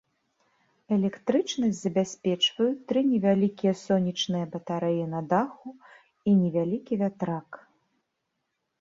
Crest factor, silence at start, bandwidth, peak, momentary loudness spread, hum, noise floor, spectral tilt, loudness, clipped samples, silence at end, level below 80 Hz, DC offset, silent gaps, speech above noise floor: 18 dB; 0.9 s; 7.8 kHz; -10 dBFS; 9 LU; none; -80 dBFS; -6 dB/octave; -27 LUFS; under 0.1%; 1.25 s; -70 dBFS; under 0.1%; none; 54 dB